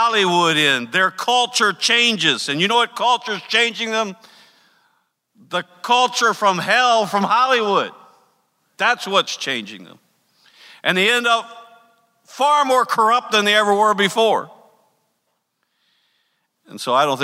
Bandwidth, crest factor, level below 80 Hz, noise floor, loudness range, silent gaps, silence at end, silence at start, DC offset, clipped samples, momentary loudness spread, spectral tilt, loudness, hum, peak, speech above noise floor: 16 kHz; 18 dB; -76 dBFS; -71 dBFS; 5 LU; none; 0 s; 0 s; under 0.1%; under 0.1%; 9 LU; -2.5 dB/octave; -17 LUFS; none; -2 dBFS; 54 dB